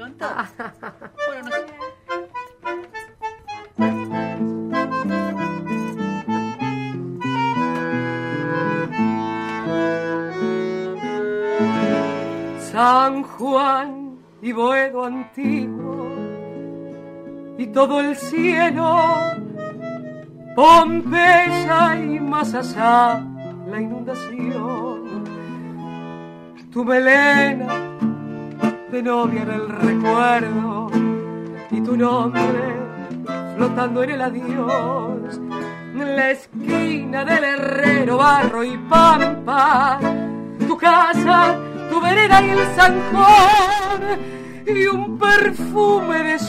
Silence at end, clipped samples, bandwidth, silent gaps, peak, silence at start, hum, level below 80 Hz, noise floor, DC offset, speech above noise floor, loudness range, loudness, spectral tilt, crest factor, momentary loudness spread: 0 s; under 0.1%; 15.5 kHz; none; -2 dBFS; 0 s; none; -48 dBFS; -38 dBFS; under 0.1%; 22 dB; 10 LU; -18 LUFS; -5.5 dB/octave; 16 dB; 18 LU